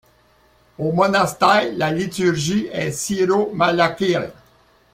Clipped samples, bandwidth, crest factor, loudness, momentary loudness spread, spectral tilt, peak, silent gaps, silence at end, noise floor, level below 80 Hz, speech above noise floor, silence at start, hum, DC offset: under 0.1%; 16.5 kHz; 18 dB; -19 LUFS; 8 LU; -4.5 dB/octave; -2 dBFS; none; 0.6 s; -56 dBFS; -54 dBFS; 37 dB; 0.8 s; none; under 0.1%